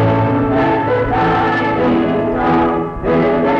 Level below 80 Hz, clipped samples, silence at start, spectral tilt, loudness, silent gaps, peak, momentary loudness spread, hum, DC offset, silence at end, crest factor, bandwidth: -34 dBFS; under 0.1%; 0 s; -8.5 dB/octave; -15 LUFS; none; -6 dBFS; 2 LU; none; under 0.1%; 0 s; 8 dB; 7.2 kHz